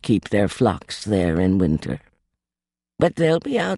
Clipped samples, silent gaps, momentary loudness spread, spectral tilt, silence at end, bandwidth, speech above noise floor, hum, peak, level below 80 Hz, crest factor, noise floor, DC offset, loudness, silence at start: under 0.1%; none; 8 LU; -6.5 dB/octave; 0 s; 11.5 kHz; over 70 dB; none; -4 dBFS; -44 dBFS; 18 dB; under -90 dBFS; under 0.1%; -21 LUFS; 0.05 s